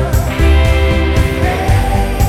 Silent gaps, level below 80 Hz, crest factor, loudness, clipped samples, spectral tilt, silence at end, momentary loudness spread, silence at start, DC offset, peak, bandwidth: none; -14 dBFS; 10 dB; -13 LUFS; under 0.1%; -6 dB/octave; 0 s; 4 LU; 0 s; under 0.1%; 0 dBFS; 15.5 kHz